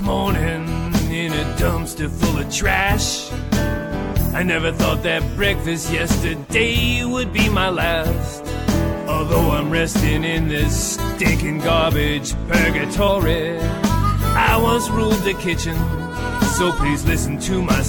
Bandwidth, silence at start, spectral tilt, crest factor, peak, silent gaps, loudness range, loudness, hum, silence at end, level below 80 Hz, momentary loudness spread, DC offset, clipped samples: 18 kHz; 0 s; -5 dB/octave; 18 dB; 0 dBFS; none; 2 LU; -19 LUFS; none; 0 s; -26 dBFS; 5 LU; under 0.1%; under 0.1%